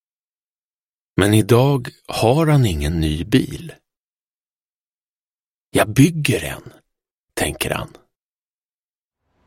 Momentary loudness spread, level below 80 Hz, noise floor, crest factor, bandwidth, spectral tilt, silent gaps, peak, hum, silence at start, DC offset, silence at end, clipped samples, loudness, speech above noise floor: 15 LU; -38 dBFS; under -90 dBFS; 20 dB; 16.5 kHz; -6 dB/octave; 3.99-4.15 s, 4.21-4.44 s, 4.51-5.72 s, 7.11-7.28 s; -2 dBFS; none; 1.15 s; under 0.1%; 1.6 s; under 0.1%; -18 LUFS; over 73 dB